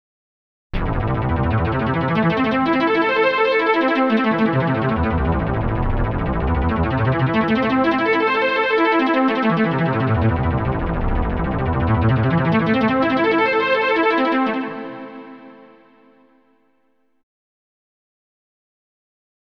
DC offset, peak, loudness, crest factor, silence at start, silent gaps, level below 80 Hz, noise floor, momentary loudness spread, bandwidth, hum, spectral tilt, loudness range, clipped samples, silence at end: under 0.1%; -6 dBFS; -18 LUFS; 14 dB; 0.75 s; none; -30 dBFS; -66 dBFS; 6 LU; 6.2 kHz; none; -8.5 dB/octave; 3 LU; under 0.1%; 4 s